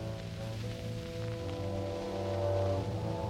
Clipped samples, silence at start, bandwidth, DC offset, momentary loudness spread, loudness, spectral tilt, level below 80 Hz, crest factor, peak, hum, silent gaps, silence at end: under 0.1%; 0 s; 15 kHz; under 0.1%; 8 LU; -36 LUFS; -7 dB/octave; -52 dBFS; 14 dB; -22 dBFS; none; none; 0 s